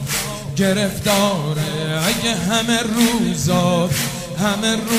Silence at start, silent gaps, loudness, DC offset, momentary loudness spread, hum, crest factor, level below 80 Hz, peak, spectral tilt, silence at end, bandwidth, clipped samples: 0 s; none; -18 LUFS; under 0.1%; 5 LU; none; 16 dB; -42 dBFS; -2 dBFS; -4 dB/octave; 0 s; 16 kHz; under 0.1%